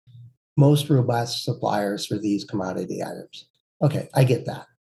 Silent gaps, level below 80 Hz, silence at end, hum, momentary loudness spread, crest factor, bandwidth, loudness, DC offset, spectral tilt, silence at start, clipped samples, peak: 0.37-0.56 s, 3.50-3.54 s, 3.60-3.80 s; -64 dBFS; 0.25 s; none; 13 LU; 18 dB; 12.5 kHz; -23 LUFS; under 0.1%; -6.5 dB/octave; 0.15 s; under 0.1%; -6 dBFS